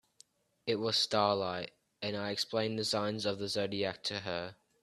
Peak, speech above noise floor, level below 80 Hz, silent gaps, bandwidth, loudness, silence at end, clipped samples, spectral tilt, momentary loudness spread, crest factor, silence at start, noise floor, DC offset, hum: -14 dBFS; 31 dB; -74 dBFS; none; 13.5 kHz; -34 LUFS; 0.3 s; under 0.1%; -4 dB/octave; 12 LU; 22 dB; 0.65 s; -65 dBFS; under 0.1%; none